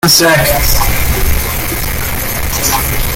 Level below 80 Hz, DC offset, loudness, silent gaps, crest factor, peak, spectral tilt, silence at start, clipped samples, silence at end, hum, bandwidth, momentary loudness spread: -18 dBFS; under 0.1%; -12 LUFS; none; 12 dB; 0 dBFS; -3 dB/octave; 0.05 s; under 0.1%; 0 s; none; 17.5 kHz; 9 LU